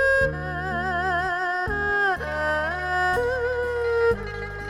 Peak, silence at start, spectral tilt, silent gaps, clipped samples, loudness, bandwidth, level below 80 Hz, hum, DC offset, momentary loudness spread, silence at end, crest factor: -12 dBFS; 0 s; -5.5 dB/octave; none; under 0.1%; -24 LUFS; 14 kHz; -40 dBFS; none; under 0.1%; 5 LU; 0 s; 12 dB